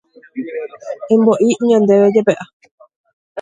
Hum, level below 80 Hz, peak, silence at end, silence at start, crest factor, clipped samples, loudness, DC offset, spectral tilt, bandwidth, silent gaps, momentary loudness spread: none; -62 dBFS; 0 dBFS; 0 s; 0.35 s; 16 dB; under 0.1%; -13 LUFS; under 0.1%; -6.5 dB/octave; 9.4 kHz; 2.53-2.60 s, 2.71-2.78 s, 2.96-3.04 s, 3.13-3.35 s; 19 LU